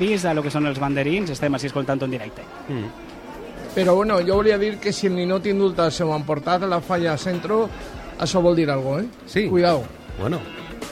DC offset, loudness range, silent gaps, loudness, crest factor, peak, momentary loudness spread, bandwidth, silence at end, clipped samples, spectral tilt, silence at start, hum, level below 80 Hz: under 0.1%; 4 LU; none; -22 LUFS; 16 dB; -4 dBFS; 16 LU; 15.5 kHz; 0 s; under 0.1%; -6 dB/octave; 0 s; none; -44 dBFS